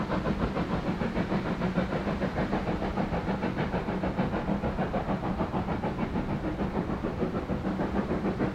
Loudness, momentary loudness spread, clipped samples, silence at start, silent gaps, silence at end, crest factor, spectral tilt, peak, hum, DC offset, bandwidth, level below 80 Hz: -31 LUFS; 2 LU; under 0.1%; 0 s; none; 0 s; 16 dB; -8 dB/octave; -14 dBFS; none; 0.1%; 9.4 kHz; -40 dBFS